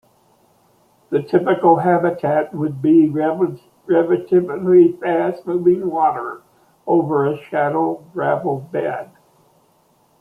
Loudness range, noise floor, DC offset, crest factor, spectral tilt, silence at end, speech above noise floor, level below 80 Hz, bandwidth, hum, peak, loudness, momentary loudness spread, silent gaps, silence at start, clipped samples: 5 LU; -58 dBFS; under 0.1%; 16 dB; -9.5 dB/octave; 1.15 s; 41 dB; -64 dBFS; 4.8 kHz; none; -2 dBFS; -18 LUFS; 10 LU; none; 1.1 s; under 0.1%